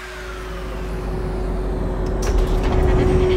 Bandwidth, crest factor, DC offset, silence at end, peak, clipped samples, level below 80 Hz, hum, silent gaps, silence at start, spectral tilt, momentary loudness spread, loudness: 11.5 kHz; 16 dB; under 0.1%; 0 s; -4 dBFS; under 0.1%; -22 dBFS; none; none; 0 s; -7 dB/octave; 13 LU; -23 LUFS